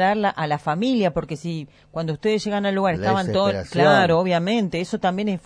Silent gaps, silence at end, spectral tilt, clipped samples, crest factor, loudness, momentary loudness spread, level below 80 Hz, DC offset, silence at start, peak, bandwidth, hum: none; 0.05 s; -6 dB/octave; under 0.1%; 16 dB; -21 LUFS; 12 LU; -52 dBFS; under 0.1%; 0 s; -4 dBFS; 10.5 kHz; none